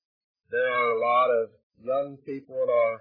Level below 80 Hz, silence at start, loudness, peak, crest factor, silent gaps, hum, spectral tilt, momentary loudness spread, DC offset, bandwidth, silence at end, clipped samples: -80 dBFS; 0.5 s; -26 LUFS; -12 dBFS; 14 dB; 1.63-1.70 s; none; -7.5 dB/octave; 13 LU; under 0.1%; 5 kHz; 0.05 s; under 0.1%